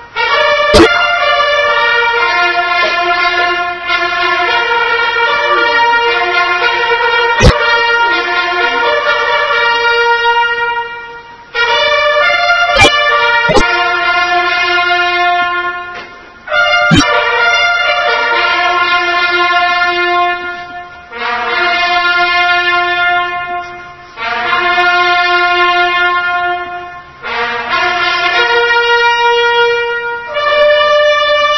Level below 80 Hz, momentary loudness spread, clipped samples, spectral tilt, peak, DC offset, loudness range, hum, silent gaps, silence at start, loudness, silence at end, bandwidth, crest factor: -30 dBFS; 9 LU; 0.4%; -3.5 dB/octave; 0 dBFS; under 0.1%; 3 LU; none; none; 0 s; -10 LUFS; 0 s; 11 kHz; 12 dB